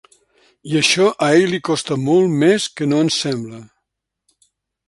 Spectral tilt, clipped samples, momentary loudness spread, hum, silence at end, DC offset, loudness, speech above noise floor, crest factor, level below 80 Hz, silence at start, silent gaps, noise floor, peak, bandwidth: -4.5 dB/octave; under 0.1%; 8 LU; none; 1.25 s; under 0.1%; -16 LUFS; 61 dB; 18 dB; -60 dBFS; 0.65 s; none; -77 dBFS; -2 dBFS; 11.5 kHz